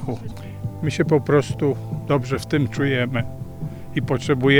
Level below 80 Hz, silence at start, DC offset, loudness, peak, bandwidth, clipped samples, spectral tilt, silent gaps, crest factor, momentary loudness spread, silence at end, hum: -44 dBFS; 0 s; under 0.1%; -23 LUFS; -2 dBFS; 19 kHz; under 0.1%; -6.5 dB/octave; none; 20 dB; 13 LU; 0 s; none